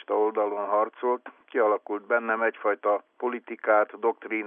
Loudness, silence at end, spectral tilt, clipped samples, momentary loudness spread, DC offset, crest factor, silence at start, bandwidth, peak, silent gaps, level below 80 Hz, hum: -27 LUFS; 0 s; -8.5 dB/octave; under 0.1%; 8 LU; under 0.1%; 18 dB; 0.1 s; 3.7 kHz; -8 dBFS; none; under -90 dBFS; none